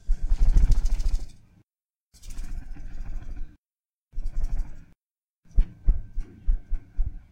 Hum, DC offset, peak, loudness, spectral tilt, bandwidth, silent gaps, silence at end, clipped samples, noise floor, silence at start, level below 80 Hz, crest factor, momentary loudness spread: none; under 0.1%; -6 dBFS; -32 LUFS; -6.5 dB/octave; 7.4 kHz; 1.85-1.89 s, 1.96-2.10 s, 3.58-3.62 s, 3.93-3.99 s, 4.97-5.16 s, 5.23-5.41 s; 0.15 s; under 0.1%; under -90 dBFS; 0.05 s; -26 dBFS; 18 dB; 19 LU